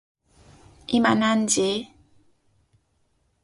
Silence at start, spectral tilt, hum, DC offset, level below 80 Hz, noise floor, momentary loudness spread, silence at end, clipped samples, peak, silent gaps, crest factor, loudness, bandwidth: 0.9 s; -3.5 dB/octave; none; under 0.1%; -60 dBFS; -68 dBFS; 20 LU; 1.6 s; under 0.1%; -6 dBFS; none; 20 dB; -22 LUFS; 11.5 kHz